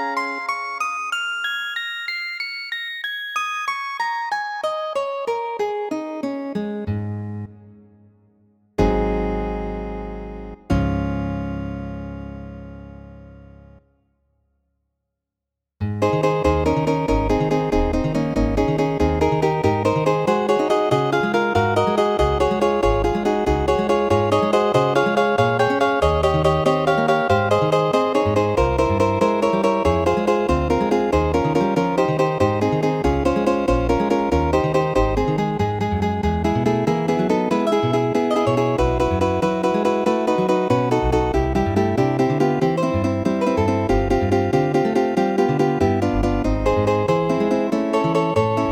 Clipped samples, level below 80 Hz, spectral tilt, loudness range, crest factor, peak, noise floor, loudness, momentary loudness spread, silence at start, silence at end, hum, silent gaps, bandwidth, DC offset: under 0.1%; -32 dBFS; -6.5 dB/octave; 8 LU; 16 dB; -4 dBFS; -84 dBFS; -20 LUFS; 8 LU; 0 s; 0 s; none; none; 17 kHz; under 0.1%